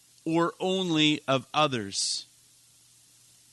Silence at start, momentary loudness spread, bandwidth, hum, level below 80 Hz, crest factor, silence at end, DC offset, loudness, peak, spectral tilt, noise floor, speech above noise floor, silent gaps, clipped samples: 0.25 s; 6 LU; 12 kHz; none; -74 dBFS; 20 dB; 1.3 s; under 0.1%; -27 LUFS; -10 dBFS; -3.5 dB/octave; -59 dBFS; 33 dB; none; under 0.1%